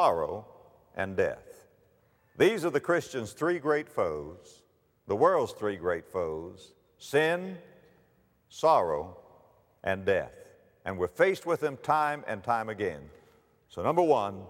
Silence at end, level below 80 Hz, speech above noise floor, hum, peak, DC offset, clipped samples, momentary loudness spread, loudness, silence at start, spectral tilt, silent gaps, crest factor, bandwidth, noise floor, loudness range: 0 s; -64 dBFS; 38 dB; none; -10 dBFS; under 0.1%; under 0.1%; 17 LU; -29 LUFS; 0 s; -5.5 dB/octave; none; 20 dB; 16.5 kHz; -67 dBFS; 2 LU